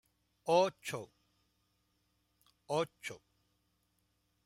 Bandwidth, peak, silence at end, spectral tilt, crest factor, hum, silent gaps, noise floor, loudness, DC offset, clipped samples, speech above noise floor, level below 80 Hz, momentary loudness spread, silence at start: 16 kHz; -18 dBFS; 1.3 s; -4.5 dB/octave; 22 dB; 60 Hz at -80 dBFS; none; -79 dBFS; -35 LUFS; under 0.1%; under 0.1%; 44 dB; -80 dBFS; 19 LU; 0.45 s